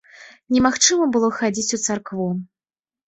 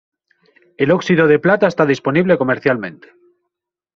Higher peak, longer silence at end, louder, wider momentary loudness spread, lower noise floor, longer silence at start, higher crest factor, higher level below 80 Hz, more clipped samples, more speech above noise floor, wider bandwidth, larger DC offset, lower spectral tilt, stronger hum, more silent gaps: about the same, 0 dBFS vs -2 dBFS; second, 0.65 s vs 1.05 s; second, -19 LUFS vs -15 LUFS; first, 10 LU vs 7 LU; first, under -90 dBFS vs -79 dBFS; second, 0.2 s vs 0.8 s; about the same, 20 dB vs 16 dB; about the same, -54 dBFS vs -56 dBFS; neither; first, over 70 dB vs 64 dB; first, 8.4 kHz vs 7.4 kHz; neither; second, -3 dB/octave vs -5.5 dB/octave; neither; neither